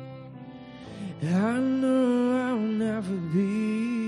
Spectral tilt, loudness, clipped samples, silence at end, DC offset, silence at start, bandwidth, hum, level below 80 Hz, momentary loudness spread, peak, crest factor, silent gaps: -7.5 dB/octave; -26 LUFS; under 0.1%; 0 s; under 0.1%; 0 s; 11 kHz; none; -66 dBFS; 19 LU; -14 dBFS; 12 dB; none